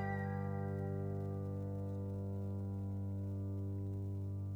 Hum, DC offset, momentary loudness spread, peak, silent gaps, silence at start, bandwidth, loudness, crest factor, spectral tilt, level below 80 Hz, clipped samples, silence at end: 50 Hz at -85 dBFS; under 0.1%; 2 LU; -30 dBFS; none; 0 s; 2.5 kHz; -42 LUFS; 12 dB; -10 dB/octave; -66 dBFS; under 0.1%; 0 s